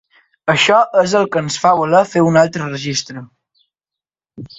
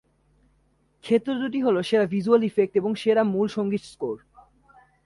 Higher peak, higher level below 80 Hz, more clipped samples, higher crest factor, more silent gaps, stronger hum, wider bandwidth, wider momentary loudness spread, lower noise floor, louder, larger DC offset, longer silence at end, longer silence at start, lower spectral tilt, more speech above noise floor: first, 0 dBFS vs -6 dBFS; first, -56 dBFS vs -66 dBFS; neither; about the same, 16 dB vs 18 dB; neither; neither; second, 8.2 kHz vs 11.5 kHz; about the same, 11 LU vs 12 LU; first, -87 dBFS vs -65 dBFS; first, -14 LUFS vs -24 LUFS; neither; second, 0.15 s vs 0.9 s; second, 0.45 s vs 1.05 s; second, -4.5 dB/octave vs -7 dB/octave; first, 73 dB vs 42 dB